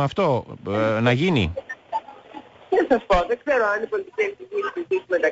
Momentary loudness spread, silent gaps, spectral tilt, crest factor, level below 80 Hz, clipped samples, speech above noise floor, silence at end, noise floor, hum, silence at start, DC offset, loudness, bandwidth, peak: 12 LU; none; -7 dB/octave; 16 dB; -42 dBFS; under 0.1%; 21 dB; 0 s; -43 dBFS; none; 0 s; under 0.1%; -23 LUFS; 8 kHz; -8 dBFS